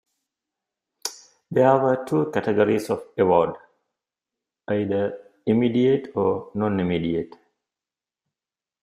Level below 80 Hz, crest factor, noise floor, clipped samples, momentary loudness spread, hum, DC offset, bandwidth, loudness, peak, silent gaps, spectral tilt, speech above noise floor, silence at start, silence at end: -62 dBFS; 20 dB; under -90 dBFS; under 0.1%; 13 LU; none; under 0.1%; 15 kHz; -23 LUFS; -4 dBFS; none; -6.5 dB/octave; over 69 dB; 1.05 s; 1.55 s